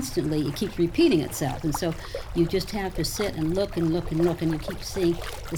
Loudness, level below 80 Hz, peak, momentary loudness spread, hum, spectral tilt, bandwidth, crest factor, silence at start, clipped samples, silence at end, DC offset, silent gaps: -26 LUFS; -40 dBFS; -10 dBFS; 8 LU; none; -5.5 dB/octave; 20 kHz; 16 dB; 0 s; under 0.1%; 0 s; under 0.1%; none